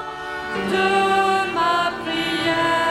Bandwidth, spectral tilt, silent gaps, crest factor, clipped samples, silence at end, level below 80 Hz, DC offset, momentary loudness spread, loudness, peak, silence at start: 15 kHz; -4 dB/octave; none; 14 dB; under 0.1%; 0 s; -52 dBFS; under 0.1%; 9 LU; -20 LUFS; -6 dBFS; 0 s